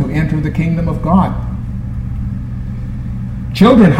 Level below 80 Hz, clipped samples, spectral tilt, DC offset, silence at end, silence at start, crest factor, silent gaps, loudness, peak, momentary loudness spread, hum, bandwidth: -24 dBFS; under 0.1%; -8.5 dB/octave; under 0.1%; 0 s; 0 s; 14 dB; none; -16 LUFS; 0 dBFS; 12 LU; none; 11 kHz